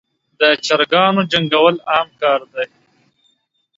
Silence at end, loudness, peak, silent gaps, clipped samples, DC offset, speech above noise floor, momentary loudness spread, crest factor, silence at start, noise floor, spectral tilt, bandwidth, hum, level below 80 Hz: 1.1 s; -15 LUFS; 0 dBFS; none; under 0.1%; under 0.1%; 49 dB; 10 LU; 18 dB; 0.4 s; -64 dBFS; -4.5 dB/octave; 7.8 kHz; none; -62 dBFS